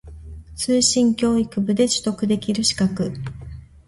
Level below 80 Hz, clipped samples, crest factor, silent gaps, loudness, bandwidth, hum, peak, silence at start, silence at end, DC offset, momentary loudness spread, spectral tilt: -44 dBFS; under 0.1%; 18 dB; none; -20 LUFS; 11.5 kHz; none; -4 dBFS; 0.05 s; 0.25 s; under 0.1%; 21 LU; -4 dB/octave